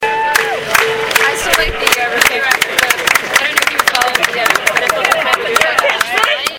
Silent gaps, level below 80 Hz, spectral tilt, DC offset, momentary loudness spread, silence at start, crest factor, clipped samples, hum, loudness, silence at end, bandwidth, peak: none; -38 dBFS; -0.5 dB/octave; under 0.1%; 2 LU; 0 s; 14 dB; 0.3%; none; -12 LUFS; 0 s; over 20 kHz; 0 dBFS